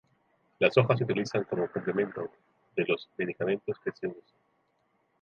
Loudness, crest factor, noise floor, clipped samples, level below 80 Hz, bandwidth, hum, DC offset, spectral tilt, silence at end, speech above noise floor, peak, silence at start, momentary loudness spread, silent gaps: -30 LUFS; 24 dB; -73 dBFS; under 0.1%; -70 dBFS; 7.2 kHz; none; under 0.1%; -7 dB/octave; 1 s; 44 dB; -8 dBFS; 0.6 s; 13 LU; none